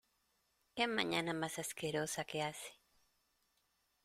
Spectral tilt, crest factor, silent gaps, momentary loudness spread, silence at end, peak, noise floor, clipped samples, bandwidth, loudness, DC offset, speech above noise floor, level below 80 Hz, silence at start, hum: -3.5 dB/octave; 24 dB; none; 13 LU; 1.3 s; -18 dBFS; -80 dBFS; under 0.1%; 16 kHz; -39 LUFS; under 0.1%; 40 dB; -76 dBFS; 0.75 s; none